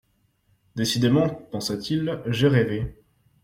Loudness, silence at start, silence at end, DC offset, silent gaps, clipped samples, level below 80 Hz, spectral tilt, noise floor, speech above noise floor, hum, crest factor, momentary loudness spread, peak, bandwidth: -24 LUFS; 0.75 s; 0.5 s; under 0.1%; none; under 0.1%; -50 dBFS; -6 dB/octave; -66 dBFS; 43 dB; none; 18 dB; 10 LU; -6 dBFS; 16 kHz